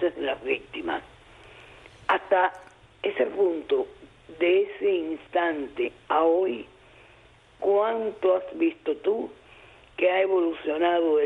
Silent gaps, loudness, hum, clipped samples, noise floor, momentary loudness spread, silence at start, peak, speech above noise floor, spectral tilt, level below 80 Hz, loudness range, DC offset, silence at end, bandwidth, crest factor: none; -26 LUFS; none; under 0.1%; -55 dBFS; 9 LU; 0 s; -10 dBFS; 30 dB; -6 dB/octave; -62 dBFS; 2 LU; under 0.1%; 0 s; 4.3 kHz; 16 dB